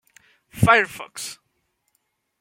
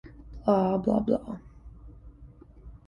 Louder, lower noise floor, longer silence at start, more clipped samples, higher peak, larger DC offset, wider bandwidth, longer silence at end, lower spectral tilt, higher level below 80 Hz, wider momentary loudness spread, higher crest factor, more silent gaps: first, -19 LUFS vs -27 LUFS; first, -73 dBFS vs -50 dBFS; first, 0.55 s vs 0.05 s; neither; first, -2 dBFS vs -10 dBFS; neither; first, 16.5 kHz vs 6.8 kHz; first, 1.05 s vs 0.1 s; second, -4.5 dB/octave vs -9.5 dB/octave; about the same, -52 dBFS vs -48 dBFS; about the same, 17 LU vs 18 LU; about the same, 22 dB vs 20 dB; neither